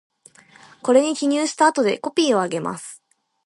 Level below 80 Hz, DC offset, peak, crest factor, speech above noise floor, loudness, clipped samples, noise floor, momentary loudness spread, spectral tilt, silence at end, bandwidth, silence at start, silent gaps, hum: -72 dBFS; under 0.1%; -4 dBFS; 18 dB; 31 dB; -20 LUFS; under 0.1%; -51 dBFS; 12 LU; -3.5 dB/octave; 0.5 s; 11.5 kHz; 0.85 s; none; none